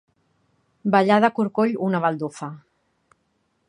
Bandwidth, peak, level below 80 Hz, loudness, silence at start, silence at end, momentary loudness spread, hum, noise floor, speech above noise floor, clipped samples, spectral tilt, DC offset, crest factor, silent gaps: 10.5 kHz; -2 dBFS; -72 dBFS; -21 LUFS; 0.85 s; 1.1 s; 14 LU; none; -70 dBFS; 49 dB; under 0.1%; -7 dB/octave; under 0.1%; 22 dB; none